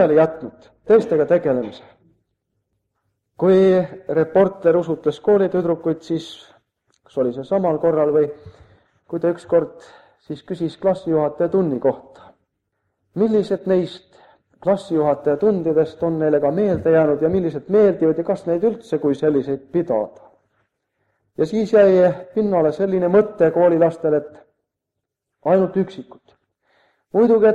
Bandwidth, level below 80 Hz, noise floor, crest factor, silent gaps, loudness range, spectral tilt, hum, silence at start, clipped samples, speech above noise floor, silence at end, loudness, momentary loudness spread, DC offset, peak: 9 kHz; -58 dBFS; -81 dBFS; 16 dB; none; 5 LU; -8.5 dB/octave; none; 0 s; under 0.1%; 63 dB; 0 s; -18 LUFS; 11 LU; under 0.1%; -2 dBFS